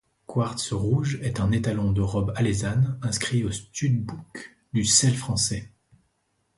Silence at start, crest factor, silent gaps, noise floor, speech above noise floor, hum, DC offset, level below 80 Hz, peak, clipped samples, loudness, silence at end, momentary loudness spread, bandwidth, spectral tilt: 0.3 s; 20 dB; none; -72 dBFS; 48 dB; none; under 0.1%; -44 dBFS; -6 dBFS; under 0.1%; -25 LUFS; 0.9 s; 11 LU; 11.5 kHz; -4.5 dB/octave